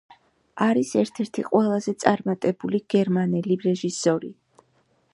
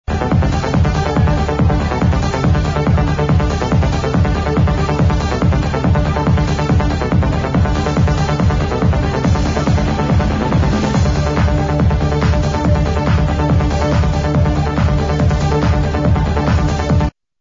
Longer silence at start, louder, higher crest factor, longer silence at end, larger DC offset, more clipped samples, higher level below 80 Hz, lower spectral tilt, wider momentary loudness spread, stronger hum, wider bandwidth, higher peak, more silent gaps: first, 0.55 s vs 0.1 s; second, -23 LUFS vs -15 LUFS; first, 22 dB vs 12 dB; first, 0.8 s vs 0.3 s; neither; neither; second, -70 dBFS vs -20 dBFS; about the same, -6 dB/octave vs -7 dB/octave; first, 6 LU vs 1 LU; neither; first, 11.5 kHz vs 7.6 kHz; about the same, -2 dBFS vs -2 dBFS; neither